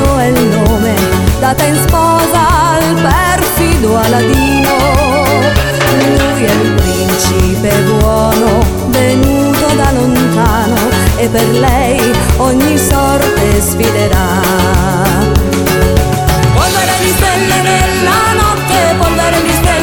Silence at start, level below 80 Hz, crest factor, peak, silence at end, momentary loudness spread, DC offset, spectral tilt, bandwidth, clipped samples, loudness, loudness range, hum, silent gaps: 0 s; -18 dBFS; 10 dB; 0 dBFS; 0 s; 2 LU; under 0.1%; -5 dB/octave; 19 kHz; under 0.1%; -10 LUFS; 1 LU; none; none